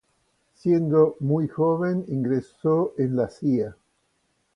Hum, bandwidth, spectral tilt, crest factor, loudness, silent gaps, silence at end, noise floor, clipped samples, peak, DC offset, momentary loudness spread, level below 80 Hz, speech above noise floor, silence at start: none; 9.8 kHz; -10.5 dB/octave; 18 dB; -24 LUFS; none; 0.85 s; -70 dBFS; under 0.1%; -6 dBFS; under 0.1%; 6 LU; -62 dBFS; 48 dB; 0.65 s